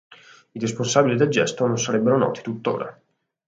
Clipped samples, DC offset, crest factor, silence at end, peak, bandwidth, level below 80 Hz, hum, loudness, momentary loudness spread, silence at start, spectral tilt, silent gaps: under 0.1%; under 0.1%; 20 dB; 0.55 s; -2 dBFS; 9.2 kHz; -64 dBFS; none; -22 LUFS; 10 LU; 0.55 s; -5 dB/octave; none